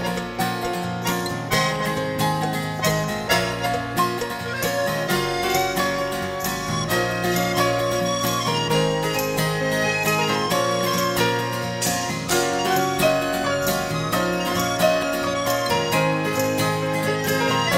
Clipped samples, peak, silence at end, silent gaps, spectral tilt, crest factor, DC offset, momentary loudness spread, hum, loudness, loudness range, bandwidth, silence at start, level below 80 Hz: under 0.1%; -6 dBFS; 0 s; none; -4 dB/octave; 16 dB; under 0.1%; 5 LU; none; -22 LUFS; 2 LU; 16.5 kHz; 0 s; -48 dBFS